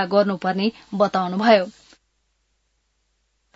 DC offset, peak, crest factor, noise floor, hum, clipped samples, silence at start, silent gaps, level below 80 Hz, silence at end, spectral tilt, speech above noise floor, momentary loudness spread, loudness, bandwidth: under 0.1%; 0 dBFS; 22 dB; -70 dBFS; none; under 0.1%; 0 s; none; -66 dBFS; 1.85 s; -6.5 dB/octave; 50 dB; 8 LU; -20 LUFS; 7.8 kHz